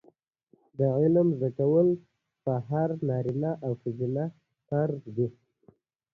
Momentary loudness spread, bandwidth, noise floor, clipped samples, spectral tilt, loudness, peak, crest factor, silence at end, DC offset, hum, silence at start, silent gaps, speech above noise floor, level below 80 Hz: 10 LU; 4.3 kHz; -67 dBFS; under 0.1%; -12 dB/octave; -28 LUFS; -12 dBFS; 16 dB; 0.8 s; under 0.1%; none; 0.8 s; none; 40 dB; -66 dBFS